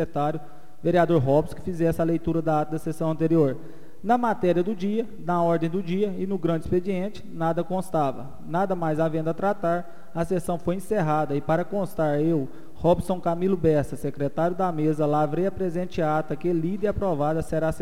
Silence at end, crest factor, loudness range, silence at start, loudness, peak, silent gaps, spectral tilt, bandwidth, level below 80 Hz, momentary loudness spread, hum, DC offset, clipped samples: 0 s; 16 dB; 2 LU; 0 s; -25 LUFS; -8 dBFS; none; -8 dB/octave; 15.5 kHz; -48 dBFS; 7 LU; none; 2%; under 0.1%